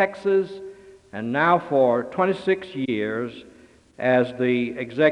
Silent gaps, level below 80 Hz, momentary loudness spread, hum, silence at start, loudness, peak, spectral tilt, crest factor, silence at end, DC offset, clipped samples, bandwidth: none; -64 dBFS; 13 LU; none; 0 s; -23 LUFS; -6 dBFS; -7.5 dB/octave; 18 dB; 0 s; under 0.1%; under 0.1%; 9.8 kHz